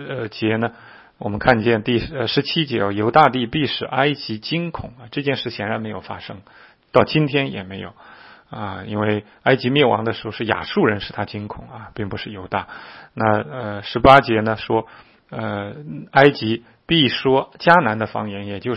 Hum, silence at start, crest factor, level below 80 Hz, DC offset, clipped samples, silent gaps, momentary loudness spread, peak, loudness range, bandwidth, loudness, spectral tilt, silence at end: none; 0 s; 20 dB; -46 dBFS; under 0.1%; under 0.1%; none; 17 LU; 0 dBFS; 6 LU; 8.4 kHz; -19 LUFS; -8 dB/octave; 0 s